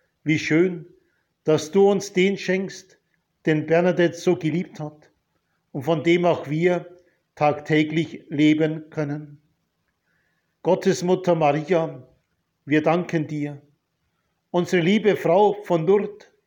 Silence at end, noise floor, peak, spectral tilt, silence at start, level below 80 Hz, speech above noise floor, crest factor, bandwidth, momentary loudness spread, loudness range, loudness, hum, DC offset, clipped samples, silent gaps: 0.3 s; -73 dBFS; -6 dBFS; -6.5 dB/octave; 0.25 s; -70 dBFS; 52 dB; 16 dB; 17 kHz; 11 LU; 3 LU; -22 LUFS; none; under 0.1%; under 0.1%; none